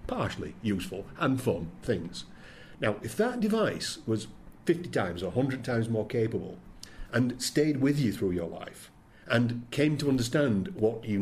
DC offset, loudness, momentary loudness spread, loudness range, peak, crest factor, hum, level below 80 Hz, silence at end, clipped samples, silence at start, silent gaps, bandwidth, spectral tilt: under 0.1%; -30 LUFS; 16 LU; 3 LU; -10 dBFS; 20 dB; none; -52 dBFS; 0 s; under 0.1%; 0 s; none; 15.5 kHz; -6 dB/octave